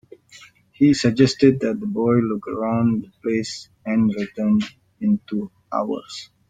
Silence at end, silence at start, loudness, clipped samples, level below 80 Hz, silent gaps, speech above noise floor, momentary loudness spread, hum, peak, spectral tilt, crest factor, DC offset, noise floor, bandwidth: 0.25 s; 0.35 s; -21 LUFS; under 0.1%; -58 dBFS; none; 28 dB; 12 LU; none; -2 dBFS; -6.5 dB/octave; 18 dB; under 0.1%; -48 dBFS; 9.2 kHz